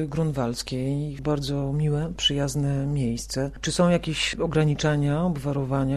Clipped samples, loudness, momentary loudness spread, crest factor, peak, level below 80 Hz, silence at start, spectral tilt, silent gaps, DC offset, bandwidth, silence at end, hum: under 0.1%; -25 LUFS; 6 LU; 16 dB; -8 dBFS; -42 dBFS; 0 s; -5.5 dB/octave; none; under 0.1%; 13 kHz; 0 s; none